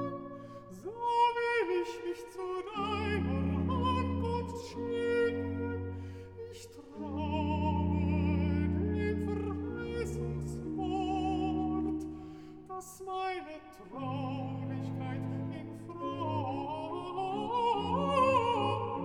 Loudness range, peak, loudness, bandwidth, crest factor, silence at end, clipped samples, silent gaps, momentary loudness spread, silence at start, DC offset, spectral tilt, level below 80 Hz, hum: 6 LU; -16 dBFS; -34 LUFS; 12.5 kHz; 18 dB; 0 s; under 0.1%; none; 14 LU; 0 s; under 0.1%; -7 dB/octave; -50 dBFS; none